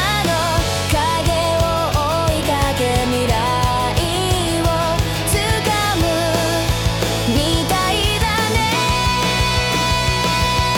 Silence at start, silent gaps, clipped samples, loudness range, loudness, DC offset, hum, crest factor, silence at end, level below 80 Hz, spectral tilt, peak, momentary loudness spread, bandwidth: 0 s; none; under 0.1%; 1 LU; -17 LUFS; under 0.1%; none; 12 dB; 0 s; -28 dBFS; -4 dB/octave; -6 dBFS; 2 LU; 18 kHz